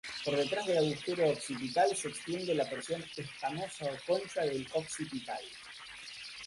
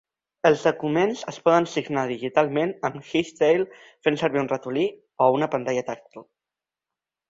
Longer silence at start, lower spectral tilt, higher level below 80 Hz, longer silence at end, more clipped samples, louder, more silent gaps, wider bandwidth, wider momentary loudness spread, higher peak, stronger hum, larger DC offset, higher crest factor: second, 0.05 s vs 0.45 s; second, -4 dB/octave vs -5.5 dB/octave; second, -72 dBFS vs -66 dBFS; second, 0 s vs 1.1 s; neither; second, -35 LUFS vs -24 LUFS; neither; first, 11.5 kHz vs 7.8 kHz; first, 13 LU vs 7 LU; second, -16 dBFS vs -4 dBFS; neither; neither; about the same, 18 dB vs 20 dB